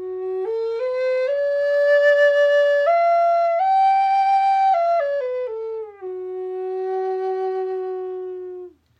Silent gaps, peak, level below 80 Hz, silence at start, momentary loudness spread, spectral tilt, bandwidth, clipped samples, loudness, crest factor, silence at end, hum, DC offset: none; -8 dBFS; -70 dBFS; 0 s; 15 LU; -3.5 dB/octave; 8.2 kHz; under 0.1%; -19 LUFS; 12 dB; 0.3 s; none; under 0.1%